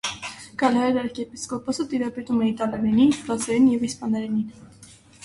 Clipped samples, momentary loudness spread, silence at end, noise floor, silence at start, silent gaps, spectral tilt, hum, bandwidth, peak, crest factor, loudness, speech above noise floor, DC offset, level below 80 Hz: under 0.1%; 12 LU; 0.4 s; -48 dBFS; 0.05 s; none; -5 dB/octave; none; 11.5 kHz; -6 dBFS; 18 dB; -23 LUFS; 25 dB; under 0.1%; -56 dBFS